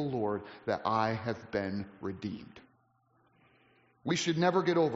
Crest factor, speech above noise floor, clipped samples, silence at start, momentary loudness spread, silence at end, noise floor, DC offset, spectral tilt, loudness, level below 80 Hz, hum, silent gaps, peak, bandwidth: 18 dB; 39 dB; under 0.1%; 0 s; 13 LU; 0 s; -71 dBFS; under 0.1%; -4.5 dB/octave; -33 LUFS; -70 dBFS; none; none; -16 dBFS; 7.6 kHz